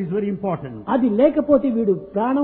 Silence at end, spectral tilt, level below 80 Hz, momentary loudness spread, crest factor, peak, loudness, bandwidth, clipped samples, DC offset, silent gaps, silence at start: 0 s; -12.5 dB/octave; -52 dBFS; 9 LU; 16 dB; -4 dBFS; -20 LUFS; 4.1 kHz; under 0.1%; under 0.1%; none; 0 s